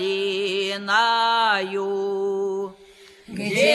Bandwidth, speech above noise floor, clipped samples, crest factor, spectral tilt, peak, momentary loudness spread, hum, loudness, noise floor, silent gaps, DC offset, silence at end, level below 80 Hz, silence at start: 13.5 kHz; 24 dB; under 0.1%; 18 dB; -3.5 dB/octave; -4 dBFS; 12 LU; none; -22 LUFS; -46 dBFS; none; under 0.1%; 0 s; -68 dBFS; 0 s